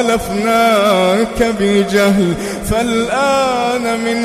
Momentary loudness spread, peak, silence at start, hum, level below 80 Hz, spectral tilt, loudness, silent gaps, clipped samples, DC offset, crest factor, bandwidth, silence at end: 5 LU; 0 dBFS; 0 s; none; -36 dBFS; -4.5 dB/octave; -14 LUFS; none; under 0.1%; under 0.1%; 14 dB; 15.5 kHz; 0 s